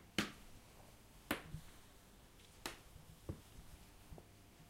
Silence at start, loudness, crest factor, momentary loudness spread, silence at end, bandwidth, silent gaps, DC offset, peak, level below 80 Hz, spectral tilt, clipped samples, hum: 0 s; -50 LUFS; 32 dB; 17 LU; 0 s; 16 kHz; none; under 0.1%; -20 dBFS; -62 dBFS; -3.5 dB/octave; under 0.1%; none